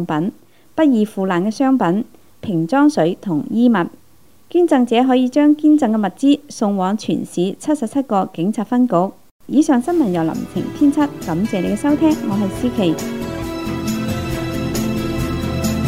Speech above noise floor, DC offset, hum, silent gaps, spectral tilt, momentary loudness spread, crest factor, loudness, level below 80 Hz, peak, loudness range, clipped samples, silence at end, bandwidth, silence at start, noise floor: 37 dB; 0.4%; none; 9.31-9.40 s; -6.5 dB/octave; 9 LU; 16 dB; -17 LUFS; -42 dBFS; 0 dBFS; 4 LU; under 0.1%; 0 s; 16 kHz; 0 s; -53 dBFS